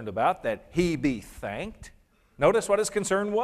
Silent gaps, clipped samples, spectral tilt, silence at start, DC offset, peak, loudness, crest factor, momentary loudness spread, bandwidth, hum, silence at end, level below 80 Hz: none; under 0.1%; -5 dB/octave; 0 s; under 0.1%; -8 dBFS; -27 LUFS; 18 dB; 12 LU; 15 kHz; none; 0 s; -50 dBFS